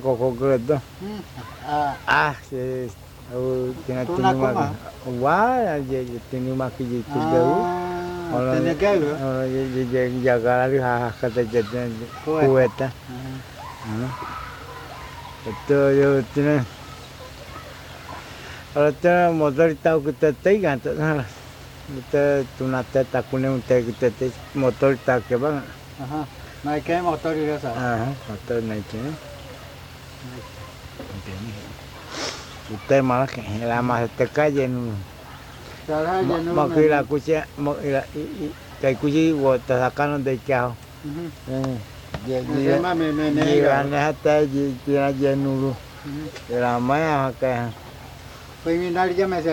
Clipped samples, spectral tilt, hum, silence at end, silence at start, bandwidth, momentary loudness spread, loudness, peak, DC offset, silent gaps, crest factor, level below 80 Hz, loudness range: under 0.1%; -7 dB/octave; none; 0 s; 0 s; 18.5 kHz; 18 LU; -22 LUFS; -4 dBFS; under 0.1%; none; 18 dB; -48 dBFS; 5 LU